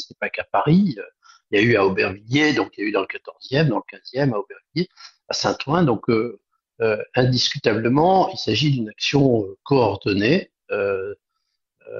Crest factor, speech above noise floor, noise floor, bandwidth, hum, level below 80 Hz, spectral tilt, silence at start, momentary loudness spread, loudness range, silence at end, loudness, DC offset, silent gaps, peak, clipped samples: 18 dB; 56 dB; -77 dBFS; 7.4 kHz; none; -54 dBFS; -6 dB/octave; 0 s; 11 LU; 4 LU; 0 s; -21 LUFS; under 0.1%; none; -2 dBFS; under 0.1%